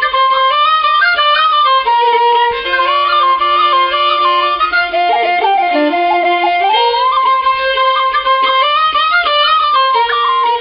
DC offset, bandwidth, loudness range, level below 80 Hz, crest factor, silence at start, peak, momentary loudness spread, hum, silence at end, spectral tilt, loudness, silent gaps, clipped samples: under 0.1%; 5.6 kHz; 1 LU; -48 dBFS; 12 dB; 0 s; 0 dBFS; 3 LU; none; 0 s; -6.5 dB/octave; -11 LUFS; none; under 0.1%